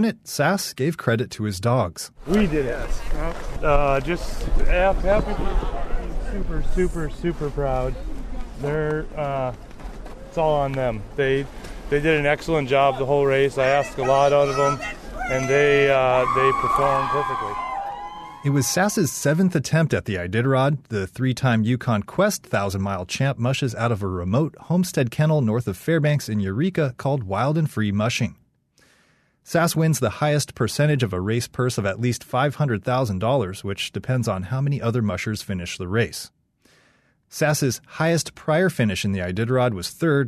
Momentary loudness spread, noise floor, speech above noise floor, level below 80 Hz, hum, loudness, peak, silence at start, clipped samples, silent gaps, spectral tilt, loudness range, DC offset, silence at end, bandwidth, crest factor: 10 LU; -61 dBFS; 40 dB; -32 dBFS; none; -22 LUFS; -6 dBFS; 0 s; under 0.1%; none; -5.5 dB/octave; 6 LU; under 0.1%; 0 s; 13.5 kHz; 14 dB